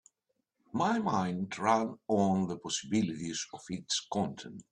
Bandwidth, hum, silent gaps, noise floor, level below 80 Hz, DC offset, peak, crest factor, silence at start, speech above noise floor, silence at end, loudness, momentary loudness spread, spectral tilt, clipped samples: 10 kHz; none; none; -82 dBFS; -70 dBFS; under 0.1%; -14 dBFS; 20 dB; 0.75 s; 50 dB; 0.1 s; -32 LUFS; 9 LU; -4.5 dB/octave; under 0.1%